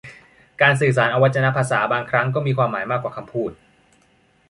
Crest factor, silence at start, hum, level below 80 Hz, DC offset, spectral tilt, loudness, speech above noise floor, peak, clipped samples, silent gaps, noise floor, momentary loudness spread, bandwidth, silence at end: 18 dB; 0.05 s; none; -58 dBFS; under 0.1%; -6 dB/octave; -19 LUFS; 40 dB; -2 dBFS; under 0.1%; none; -59 dBFS; 11 LU; 11.5 kHz; 0.95 s